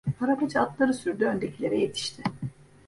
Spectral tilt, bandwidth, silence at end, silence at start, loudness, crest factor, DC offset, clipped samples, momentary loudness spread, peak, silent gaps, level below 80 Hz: -5.5 dB/octave; 11.5 kHz; 0.25 s; 0.05 s; -27 LUFS; 18 dB; under 0.1%; under 0.1%; 8 LU; -10 dBFS; none; -60 dBFS